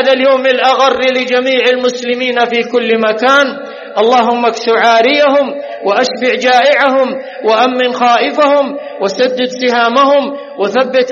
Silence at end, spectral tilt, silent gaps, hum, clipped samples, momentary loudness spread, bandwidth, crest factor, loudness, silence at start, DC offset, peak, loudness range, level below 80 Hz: 0 s; -3 dB/octave; none; none; under 0.1%; 8 LU; 7.4 kHz; 10 dB; -11 LUFS; 0 s; under 0.1%; 0 dBFS; 1 LU; -62 dBFS